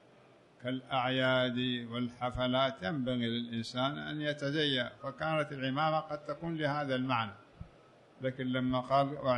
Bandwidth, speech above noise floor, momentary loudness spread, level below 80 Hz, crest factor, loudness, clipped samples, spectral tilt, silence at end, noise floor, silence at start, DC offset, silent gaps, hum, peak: 10 kHz; 28 dB; 10 LU; -62 dBFS; 18 dB; -34 LUFS; under 0.1%; -6.5 dB/octave; 0 s; -61 dBFS; 0.6 s; under 0.1%; none; none; -16 dBFS